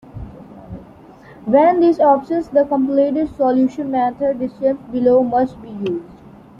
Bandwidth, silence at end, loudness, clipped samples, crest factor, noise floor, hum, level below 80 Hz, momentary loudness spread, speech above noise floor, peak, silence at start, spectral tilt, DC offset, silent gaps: 7.2 kHz; 0.45 s; -17 LUFS; under 0.1%; 16 dB; -42 dBFS; none; -48 dBFS; 22 LU; 26 dB; -2 dBFS; 0.15 s; -8.5 dB/octave; under 0.1%; none